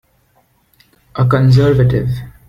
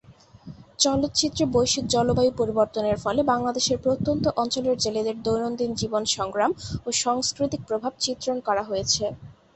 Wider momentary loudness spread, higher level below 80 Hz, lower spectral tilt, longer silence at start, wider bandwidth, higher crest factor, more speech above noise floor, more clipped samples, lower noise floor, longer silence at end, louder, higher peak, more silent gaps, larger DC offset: first, 11 LU vs 5 LU; first, -36 dBFS vs -48 dBFS; first, -8.5 dB/octave vs -3.5 dB/octave; first, 1.15 s vs 0.1 s; second, 7 kHz vs 8.6 kHz; second, 12 dB vs 18 dB; first, 45 dB vs 23 dB; neither; first, -56 dBFS vs -47 dBFS; about the same, 0.2 s vs 0.25 s; first, -13 LUFS vs -24 LUFS; first, -2 dBFS vs -6 dBFS; neither; neither